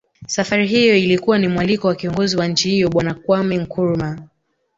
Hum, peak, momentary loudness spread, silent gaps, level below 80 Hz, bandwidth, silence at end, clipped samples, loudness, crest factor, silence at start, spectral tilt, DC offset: none; -2 dBFS; 9 LU; none; -48 dBFS; 8 kHz; 0.5 s; under 0.1%; -17 LUFS; 14 dB; 0.2 s; -5 dB/octave; under 0.1%